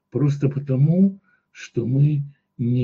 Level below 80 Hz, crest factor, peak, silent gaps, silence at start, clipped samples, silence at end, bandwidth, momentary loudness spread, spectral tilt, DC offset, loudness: -64 dBFS; 12 dB; -8 dBFS; none; 0.15 s; under 0.1%; 0 s; 7 kHz; 12 LU; -9.5 dB/octave; under 0.1%; -21 LUFS